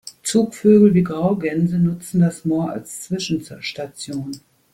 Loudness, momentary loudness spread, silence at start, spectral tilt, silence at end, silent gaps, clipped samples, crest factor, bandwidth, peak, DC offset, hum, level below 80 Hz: -19 LUFS; 16 LU; 0.05 s; -6.5 dB/octave; 0.35 s; none; under 0.1%; 16 dB; 15 kHz; -2 dBFS; under 0.1%; none; -56 dBFS